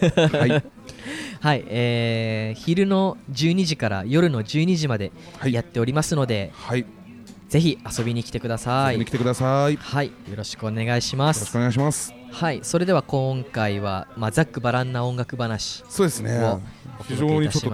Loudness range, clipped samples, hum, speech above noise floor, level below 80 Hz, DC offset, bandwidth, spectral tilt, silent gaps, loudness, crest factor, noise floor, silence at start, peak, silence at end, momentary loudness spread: 3 LU; under 0.1%; none; 20 dB; -50 dBFS; under 0.1%; 15 kHz; -5.5 dB/octave; none; -23 LUFS; 18 dB; -43 dBFS; 0 s; -4 dBFS; 0 s; 8 LU